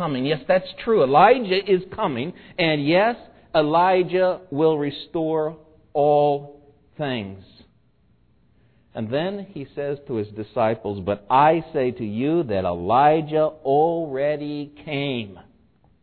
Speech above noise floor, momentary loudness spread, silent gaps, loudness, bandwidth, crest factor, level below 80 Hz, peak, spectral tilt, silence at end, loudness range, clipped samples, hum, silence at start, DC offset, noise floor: 40 dB; 13 LU; none; -21 LUFS; 4.6 kHz; 20 dB; -56 dBFS; -2 dBFS; -9.5 dB/octave; 0.6 s; 11 LU; under 0.1%; none; 0 s; under 0.1%; -61 dBFS